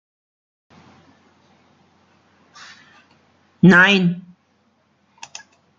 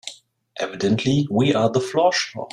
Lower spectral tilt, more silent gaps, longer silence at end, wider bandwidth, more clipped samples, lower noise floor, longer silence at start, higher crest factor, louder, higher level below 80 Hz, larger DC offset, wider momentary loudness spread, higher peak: about the same, -6 dB/octave vs -5.5 dB/octave; neither; first, 1.6 s vs 0.05 s; second, 7.6 kHz vs 12 kHz; neither; first, -62 dBFS vs -46 dBFS; first, 3.65 s vs 0.05 s; about the same, 20 dB vs 16 dB; first, -13 LUFS vs -20 LUFS; second, -62 dBFS vs -56 dBFS; neither; first, 27 LU vs 11 LU; about the same, -2 dBFS vs -4 dBFS